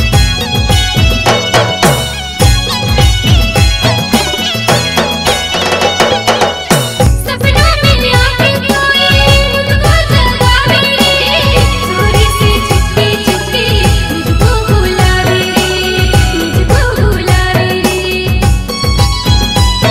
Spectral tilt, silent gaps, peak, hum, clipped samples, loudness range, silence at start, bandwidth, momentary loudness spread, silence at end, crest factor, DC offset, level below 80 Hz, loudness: -4.5 dB/octave; none; 0 dBFS; none; 0.1%; 2 LU; 0 s; 16.5 kHz; 4 LU; 0 s; 10 dB; under 0.1%; -16 dBFS; -9 LUFS